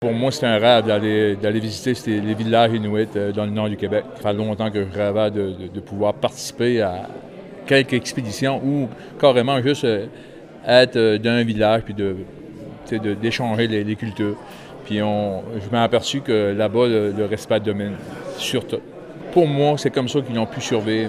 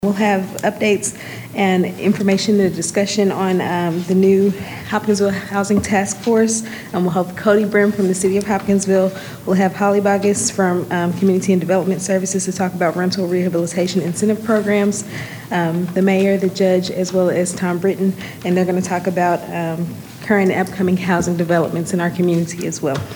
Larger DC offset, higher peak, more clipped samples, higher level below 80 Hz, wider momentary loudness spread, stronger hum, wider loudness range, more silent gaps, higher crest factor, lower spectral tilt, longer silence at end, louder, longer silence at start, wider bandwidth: neither; about the same, 0 dBFS vs -2 dBFS; neither; about the same, -56 dBFS vs -52 dBFS; first, 15 LU vs 6 LU; neither; about the same, 4 LU vs 2 LU; neither; about the same, 20 dB vs 16 dB; about the same, -5.5 dB/octave vs -5.5 dB/octave; about the same, 0 s vs 0 s; second, -20 LUFS vs -17 LUFS; about the same, 0 s vs 0 s; second, 15 kHz vs over 20 kHz